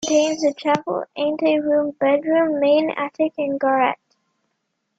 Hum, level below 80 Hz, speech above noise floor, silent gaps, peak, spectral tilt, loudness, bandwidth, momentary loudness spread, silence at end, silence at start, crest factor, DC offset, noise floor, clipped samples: none; -66 dBFS; 55 dB; none; -2 dBFS; -4 dB/octave; -20 LUFS; 7.8 kHz; 6 LU; 1.05 s; 0 s; 18 dB; under 0.1%; -74 dBFS; under 0.1%